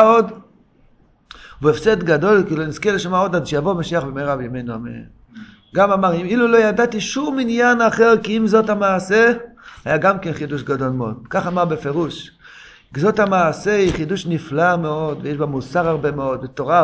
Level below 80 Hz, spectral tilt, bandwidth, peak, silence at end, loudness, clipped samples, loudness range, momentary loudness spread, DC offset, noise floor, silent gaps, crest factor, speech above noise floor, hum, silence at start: -46 dBFS; -6 dB/octave; 8 kHz; 0 dBFS; 0 s; -18 LUFS; under 0.1%; 6 LU; 11 LU; under 0.1%; -53 dBFS; none; 18 dB; 36 dB; none; 0 s